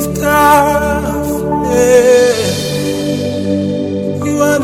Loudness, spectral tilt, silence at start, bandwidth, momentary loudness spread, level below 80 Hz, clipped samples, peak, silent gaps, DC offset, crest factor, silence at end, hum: -12 LUFS; -5 dB/octave; 0 s; 16.5 kHz; 9 LU; -34 dBFS; 0.4%; 0 dBFS; none; under 0.1%; 12 dB; 0 s; none